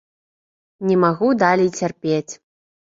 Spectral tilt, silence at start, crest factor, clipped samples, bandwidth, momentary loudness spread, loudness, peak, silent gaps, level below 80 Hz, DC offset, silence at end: -6 dB/octave; 0.8 s; 18 dB; under 0.1%; 7.8 kHz; 12 LU; -19 LUFS; -2 dBFS; none; -62 dBFS; under 0.1%; 0.55 s